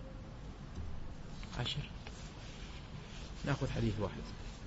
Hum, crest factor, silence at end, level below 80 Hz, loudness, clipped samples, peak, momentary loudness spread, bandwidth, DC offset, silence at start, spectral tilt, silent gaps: none; 20 dB; 0 s; -48 dBFS; -43 LUFS; under 0.1%; -22 dBFS; 13 LU; 7.6 kHz; under 0.1%; 0 s; -5 dB/octave; none